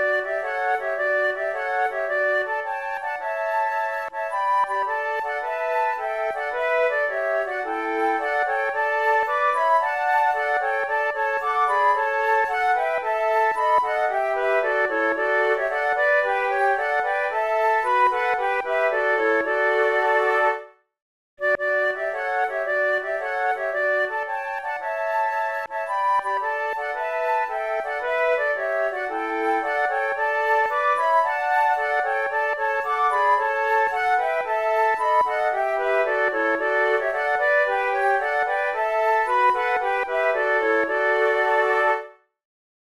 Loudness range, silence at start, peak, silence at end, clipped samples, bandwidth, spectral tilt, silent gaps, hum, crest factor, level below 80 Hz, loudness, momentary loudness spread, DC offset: 3 LU; 0 s; -8 dBFS; 0.85 s; under 0.1%; 13.5 kHz; -3 dB/octave; 21.02-21.37 s; none; 14 dB; -62 dBFS; -22 LUFS; 6 LU; 0.1%